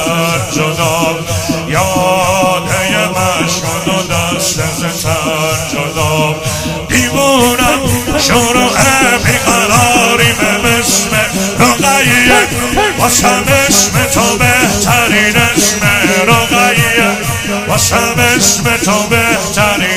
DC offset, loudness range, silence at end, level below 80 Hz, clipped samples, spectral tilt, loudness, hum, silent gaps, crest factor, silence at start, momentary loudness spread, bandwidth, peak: under 0.1%; 4 LU; 0 s; -32 dBFS; 0.3%; -3 dB/octave; -9 LUFS; none; none; 10 dB; 0 s; 6 LU; 18 kHz; 0 dBFS